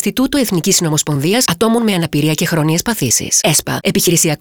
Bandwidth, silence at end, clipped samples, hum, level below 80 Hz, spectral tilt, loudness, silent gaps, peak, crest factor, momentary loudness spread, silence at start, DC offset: over 20 kHz; 0.05 s; under 0.1%; none; -44 dBFS; -3.5 dB/octave; -13 LUFS; none; -2 dBFS; 12 dB; 4 LU; 0 s; 0.2%